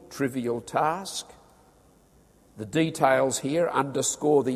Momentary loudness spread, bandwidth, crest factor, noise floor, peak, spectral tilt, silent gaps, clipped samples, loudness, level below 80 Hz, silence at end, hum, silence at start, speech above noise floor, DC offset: 12 LU; 15 kHz; 20 dB; -58 dBFS; -6 dBFS; -4 dB/octave; none; under 0.1%; -26 LUFS; -64 dBFS; 0 s; none; 0.1 s; 33 dB; under 0.1%